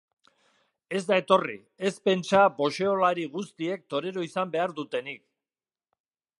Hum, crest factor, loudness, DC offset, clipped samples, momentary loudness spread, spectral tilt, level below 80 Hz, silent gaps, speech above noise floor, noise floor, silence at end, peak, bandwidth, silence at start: none; 22 dB; -27 LUFS; under 0.1%; under 0.1%; 12 LU; -5 dB/octave; -76 dBFS; none; over 64 dB; under -90 dBFS; 1.25 s; -6 dBFS; 11.5 kHz; 0.9 s